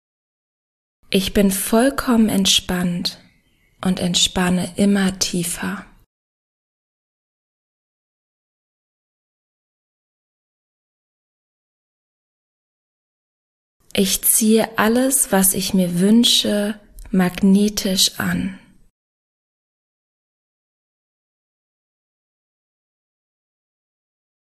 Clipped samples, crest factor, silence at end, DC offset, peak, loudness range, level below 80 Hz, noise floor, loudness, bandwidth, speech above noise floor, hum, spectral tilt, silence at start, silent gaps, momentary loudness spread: under 0.1%; 20 dB; 5.95 s; under 0.1%; -2 dBFS; 11 LU; -46 dBFS; -59 dBFS; -17 LUFS; 13.5 kHz; 42 dB; none; -3.5 dB/octave; 1.1 s; 6.06-13.80 s; 11 LU